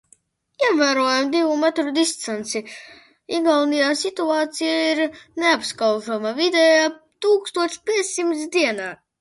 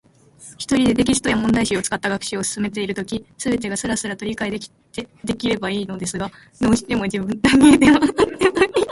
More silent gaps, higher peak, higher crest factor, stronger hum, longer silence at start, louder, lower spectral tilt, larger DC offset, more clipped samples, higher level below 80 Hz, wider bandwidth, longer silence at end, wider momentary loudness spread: neither; second, -4 dBFS vs 0 dBFS; about the same, 16 dB vs 18 dB; neither; first, 0.6 s vs 0.4 s; about the same, -20 LUFS vs -19 LUFS; second, -2 dB/octave vs -4.5 dB/octave; neither; neither; second, -70 dBFS vs -44 dBFS; about the same, 11.5 kHz vs 11.5 kHz; first, 0.25 s vs 0 s; second, 9 LU vs 16 LU